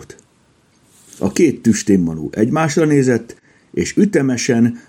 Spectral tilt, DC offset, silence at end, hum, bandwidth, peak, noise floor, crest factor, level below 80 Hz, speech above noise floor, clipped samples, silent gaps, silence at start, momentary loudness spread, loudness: -6 dB/octave; under 0.1%; 0.1 s; none; 16.5 kHz; -2 dBFS; -55 dBFS; 16 dB; -52 dBFS; 40 dB; under 0.1%; none; 0 s; 7 LU; -16 LUFS